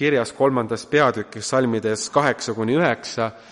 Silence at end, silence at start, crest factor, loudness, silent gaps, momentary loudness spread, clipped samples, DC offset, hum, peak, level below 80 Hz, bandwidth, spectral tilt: 0.1 s; 0 s; 18 dB; -21 LUFS; none; 6 LU; under 0.1%; under 0.1%; none; -4 dBFS; -62 dBFS; 11.5 kHz; -4.5 dB/octave